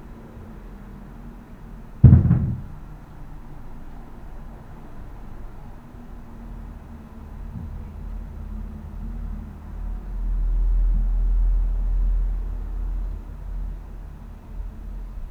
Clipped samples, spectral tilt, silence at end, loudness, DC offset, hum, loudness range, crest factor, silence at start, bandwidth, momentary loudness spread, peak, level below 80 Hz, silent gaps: under 0.1%; -10.5 dB/octave; 0 s; -25 LUFS; under 0.1%; none; 20 LU; 24 dB; 0 s; 2.7 kHz; 18 LU; 0 dBFS; -28 dBFS; none